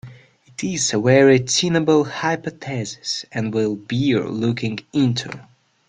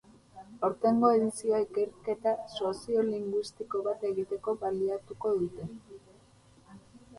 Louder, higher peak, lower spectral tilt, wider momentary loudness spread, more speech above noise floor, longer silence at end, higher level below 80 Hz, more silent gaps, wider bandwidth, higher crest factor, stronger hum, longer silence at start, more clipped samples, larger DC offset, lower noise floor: first, -19 LUFS vs -31 LUFS; first, -2 dBFS vs -10 dBFS; second, -4.5 dB/octave vs -6 dB/octave; first, 13 LU vs 10 LU; about the same, 28 dB vs 30 dB; first, 0.45 s vs 0 s; first, -56 dBFS vs -66 dBFS; neither; second, 9.6 kHz vs 11.5 kHz; about the same, 18 dB vs 20 dB; neither; second, 0.05 s vs 0.35 s; neither; neither; second, -47 dBFS vs -60 dBFS